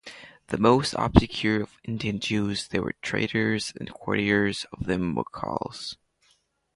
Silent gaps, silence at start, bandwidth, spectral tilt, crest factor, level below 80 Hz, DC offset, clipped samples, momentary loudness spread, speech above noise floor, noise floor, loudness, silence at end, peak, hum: none; 0.05 s; 11.5 kHz; -5.5 dB/octave; 26 dB; -42 dBFS; under 0.1%; under 0.1%; 13 LU; 41 dB; -67 dBFS; -26 LUFS; 0.8 s; 0 dBFS; none